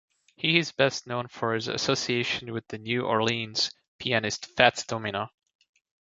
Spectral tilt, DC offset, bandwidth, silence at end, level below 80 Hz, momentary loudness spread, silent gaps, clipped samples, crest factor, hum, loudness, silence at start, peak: -3.5 dB/octave; under 0.1%; 8 kHz; 0.85 s; -64 dBFS; 12 LU; 3.88-3.99 s; under 0.1%; 28 dB; none; -27 LUFS; 0.4 s; -2 dBFS